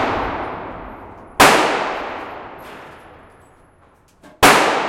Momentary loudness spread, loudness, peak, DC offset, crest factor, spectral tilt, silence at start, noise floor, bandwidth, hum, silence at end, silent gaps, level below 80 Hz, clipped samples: 25 LU; -15 LUFS; 0 dBFS; under 0.1%; 20 dB; -2.5 dB/octave; 0 s; -52 dBFS; 16.5 kHz; none; 0 s; none; -42 dBFS; under 0.1%